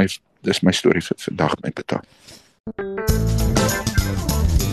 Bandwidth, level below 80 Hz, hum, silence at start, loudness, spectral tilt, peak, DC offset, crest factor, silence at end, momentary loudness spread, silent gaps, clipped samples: 13.5 kHz; -28 dBFS; none; 0 s; -21 LUFS; -5 dB/octave; -2 dBFS; under 0.1%; 18 dB; 0 s; 10 LU; 2.60-2.64 s; under 0.1%